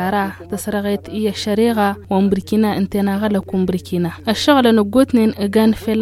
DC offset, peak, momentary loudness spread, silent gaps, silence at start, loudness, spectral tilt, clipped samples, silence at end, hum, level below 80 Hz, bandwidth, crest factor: under 0.1%; 0 dBFS; 8 LU; none; 0 s; -17 LUFS; -6 dB/octave; under 0.1%; 0 s; none; -46 dBFS; 15 kHz; 16 dB